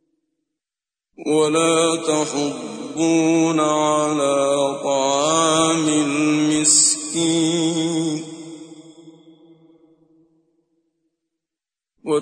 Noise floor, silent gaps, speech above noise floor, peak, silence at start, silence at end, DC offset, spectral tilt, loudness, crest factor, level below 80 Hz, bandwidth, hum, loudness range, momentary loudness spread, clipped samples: -90 dBFS; none; 72 dB; -4 dBFS; 1.2 s; 0 s; under 0.1%; -3 dB/octave; -18 LUFS; 16 dB; -66 dBFS; 10 kHz; none; 9 LU; 13 LU; under 0.1%